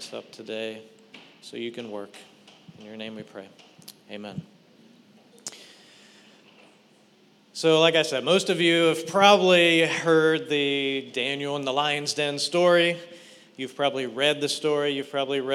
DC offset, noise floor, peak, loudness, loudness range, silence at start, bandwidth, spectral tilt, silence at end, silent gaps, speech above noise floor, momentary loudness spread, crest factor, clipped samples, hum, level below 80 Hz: under 0.1%; -58 dBFS; -2 dBFS; -22 LUFS; 22 LU; 0 s; 14.5 kHz; -3.5 dB/octave; 0 s; none; 35 dB; 22 LU; 22 dB; under 0.1%; none; -86 dBFS